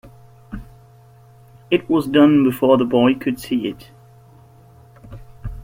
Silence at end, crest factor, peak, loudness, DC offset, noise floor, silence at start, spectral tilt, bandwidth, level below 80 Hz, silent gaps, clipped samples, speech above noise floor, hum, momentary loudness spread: 0 s; 18 dB; -2 dBFS; -17 LUFS; under 0.1%; -47 dBFS; 0.05 s; -7 dB/octave; 16.5 kHz; -44 dBFS; none; under 0.1%; 31 dB; none; 23 LU